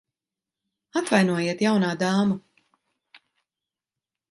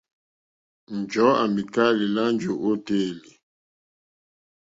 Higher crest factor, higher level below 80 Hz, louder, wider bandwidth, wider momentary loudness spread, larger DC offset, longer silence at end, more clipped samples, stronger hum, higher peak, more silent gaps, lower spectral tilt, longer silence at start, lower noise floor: about the same, 20 dB vs 20 dB; about the same, -70 dBFS vs -66 dBFS; about the same, -23 LUFS vs -23 LUFS; first, 11.5 kHz vs 7.8 kHz; second, 8 LU vs 12 LU; neither; first, 1.95 s vs 1.6 s; neither; neither; about the same, -6 dBFS vs -6 dBFS; neither; about the same, -5.5 dB/octave vs -6 dB/octave; about the same, 0.95 s vs 0.9 s; about the same, -89 dBFS vs under -90 dBFS